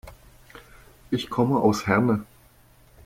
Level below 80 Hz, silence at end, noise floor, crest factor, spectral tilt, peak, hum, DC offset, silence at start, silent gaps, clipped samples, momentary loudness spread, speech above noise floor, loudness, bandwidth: -52 dBFS; 0.8 s; -55 dBFS; 20 dB; -6.5 dB/octave; -6 dBFS; none; under 0.1%; 0.05 s; none; under 0.1%; 9 LU; 33 dB; -23 LUFS; 16.5 kHz